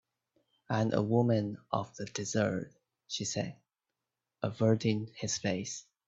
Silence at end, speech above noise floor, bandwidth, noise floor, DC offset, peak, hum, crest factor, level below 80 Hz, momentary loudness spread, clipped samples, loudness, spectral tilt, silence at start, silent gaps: 0.25 s; 57 dB; 8 kHz; -89 dBFS; under 0.1%; -12 dBFS; none; 22 dB; -68 dBFS; 11 LU; under 0.1%; -33 LUFS; -5.5 dB/octave; 0.7 s; none